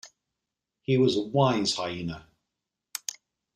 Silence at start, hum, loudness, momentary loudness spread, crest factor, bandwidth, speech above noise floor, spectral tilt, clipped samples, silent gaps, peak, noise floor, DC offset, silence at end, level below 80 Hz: 0.05 s; none; -27 LUFS; 16 LU; 20 dB; 15.5 kHz; 61 dB; -5 dB/octave; under 0.1%; none; -10 dBFS; -86 dBFS; under 0.1%; 1.35 s; -62 dBFS